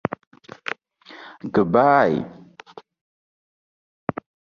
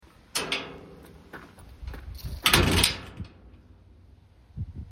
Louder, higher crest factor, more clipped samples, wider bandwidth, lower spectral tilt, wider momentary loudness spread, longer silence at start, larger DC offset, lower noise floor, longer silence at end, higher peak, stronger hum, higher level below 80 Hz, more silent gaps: first, -21 LUFS vs -24 LUFS; about the same, 22 dB vs 26 dB; neither; second, 7 kHz vs 16.5 kHz; first, -8 dB/octave vs -3 dB/octave; about the same, 24 LU vs 26 LU; first, 0.7 s vs 0.35 s; neither; second, -46 dBFS vs -54 dBFS; first, 2.25 s vs 0 s; about the same, -4 dBFS vs -4 dBFS; neither; second, -60 dBFS vs -40 dBFS; neither